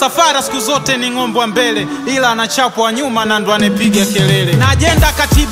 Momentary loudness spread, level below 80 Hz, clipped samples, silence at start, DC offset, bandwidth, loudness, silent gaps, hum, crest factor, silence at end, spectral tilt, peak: 4 LU; -24 dBFS; under 0.1%; 0 s; under 0.1%; 16.5 kHz; -12 LUFS; none; none; 12 dB; 0 s; -4 dB/octave; 0 dBFS